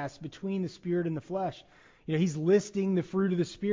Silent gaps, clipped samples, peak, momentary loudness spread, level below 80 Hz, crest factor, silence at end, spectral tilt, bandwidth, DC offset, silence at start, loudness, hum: none; under 0.1%; -14 dBFS; 12 LU; -66 dBFS; 16 dB; 0 s; -7 dB/octave; 7.6 kHz; under 0.1%; 0 s; -30 LUFS; none